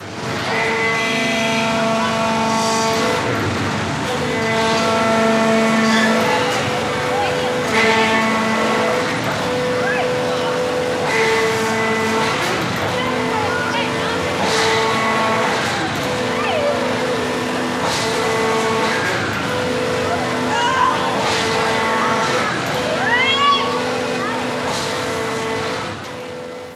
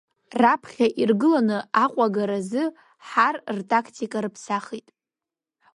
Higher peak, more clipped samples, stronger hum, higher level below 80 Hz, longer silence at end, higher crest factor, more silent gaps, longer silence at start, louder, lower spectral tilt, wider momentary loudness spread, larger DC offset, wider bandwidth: about the same, -2 dBFS vs -4 dBFS; neither; neither; first, -48 dBFS vs -72 dBFS; second, 0 s vs 0.95 s; about the same, 16 dB vs 20 dB; neither; second, 0 s vs 0.35 s; first, -17 LUFS vs -23 LUFS; second, -4 dB/octave vs -5.5 dB/octave; second, 6 LU vs 10 LU; neither; first, 15.5 kHz vs 11.5 kHz